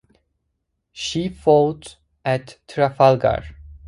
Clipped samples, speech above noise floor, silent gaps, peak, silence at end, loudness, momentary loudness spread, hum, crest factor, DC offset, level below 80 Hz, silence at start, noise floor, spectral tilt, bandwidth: under 0.1%; 56 dB; none; 0 dBFS; 0 s; -20 LUFS; 15 LU; none; 20 dB; under 0.1%; -46 dBFS; 0.95 s; -74 dBFS; -6 dB/octave; 11.5 kHz